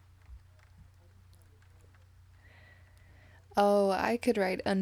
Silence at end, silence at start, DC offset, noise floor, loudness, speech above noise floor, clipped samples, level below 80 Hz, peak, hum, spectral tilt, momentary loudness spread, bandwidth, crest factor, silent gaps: 0 s; 0.3 s; under 0.1%; -58 dBFS; -29 LUFS; 31 dB; under 0.1%; -62 dBFS; -14 dBFS; none; -6 dB/octave; 5 LU; 16 kHz; 20 dB; none